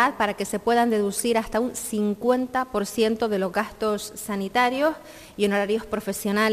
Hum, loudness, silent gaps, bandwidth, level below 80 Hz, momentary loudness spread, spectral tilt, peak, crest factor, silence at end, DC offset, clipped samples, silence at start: none; -24 LUFS; none; 15.5 kHz; -52 dBFS; 6 LU; -4 dB/octave; -6 dBFS; 16 dB; 0 s; under 0.1%; under 0.1%; 0 s